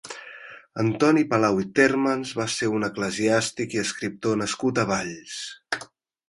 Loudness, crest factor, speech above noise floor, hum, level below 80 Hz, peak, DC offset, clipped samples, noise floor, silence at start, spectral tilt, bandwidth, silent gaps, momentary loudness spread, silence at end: -24 LUFS; 20 dB; 24 dB; none; -60 dBFS; -4 dBFS; under 0.1%; under 0.1%; -47 dBFS; 0.05 s; -4.5 dB/octave; 11.5 kHz; none; 14 LU; 0.45 s